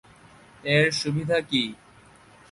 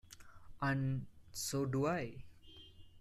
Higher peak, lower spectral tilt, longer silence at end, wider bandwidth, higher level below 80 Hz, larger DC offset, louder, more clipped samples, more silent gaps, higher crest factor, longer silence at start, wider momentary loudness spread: first, -8 dBFS vs -24 dBFS; about the same, -4.5 dB/octave vs -5.5 dB/octave; first, 0.75 s vs 0 s; second, 11.5 kHz vs 14 kHz; about the same, -60 dBFS vs -62 dBFS; neither; first, -24 LUFS vs -39 LUFS; neither; neither; about the same, 20 dB vs 18 dB; first, 0.65 s vs 0.1 s; second, 10 LU vs 22 LU